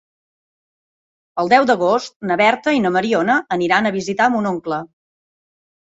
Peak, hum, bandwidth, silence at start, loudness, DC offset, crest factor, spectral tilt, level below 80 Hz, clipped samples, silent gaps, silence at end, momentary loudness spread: 0 dBFS; none; 8 kHz; 1.35 s; -17 LUFS; under 0.1%; 18 dB; -5 dB/octave; -62 dBFS; under 0.1%; 2.16-2.20 s; 1.1 s; 9 LU